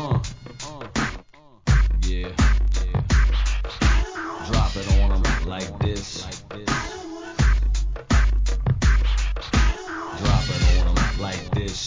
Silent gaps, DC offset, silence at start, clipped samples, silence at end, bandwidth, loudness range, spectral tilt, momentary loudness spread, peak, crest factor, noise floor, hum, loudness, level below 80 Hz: none; 0.2%; 0 s; under 0.1%; 0 s; 7.6 kHz; 3 LU; -5 dB/octave; 10 LU; -6 dBFS; 14 dB; -48 dBFS; none; -23 LUFS; -22 dBFS